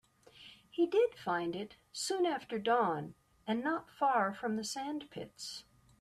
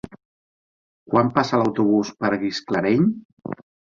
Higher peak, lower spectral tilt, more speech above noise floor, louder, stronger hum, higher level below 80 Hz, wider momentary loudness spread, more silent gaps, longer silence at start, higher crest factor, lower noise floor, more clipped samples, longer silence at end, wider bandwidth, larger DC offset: second, -20 dBFS vs -2 dBFS; second, -4 dB/octave vs -6.5 dB/octave; second, 24 dB vs over 70 dB; second, -35 LUFS vs -21 LUFS; neither; second, -76 dBFS vs -58 dBFS; about the same, 17 LU vs 16 LU; second, none vs 3.25-3.37 s; second, 0.4 s vs 1.1 s; about the same, 16 dB vs 20 dB; second, -59 dBFS vs under -90 dBFS; neither; about the same, 0.4 s vs 0.4 s; first, 13.5 kHz vs 7.6 kHz; neither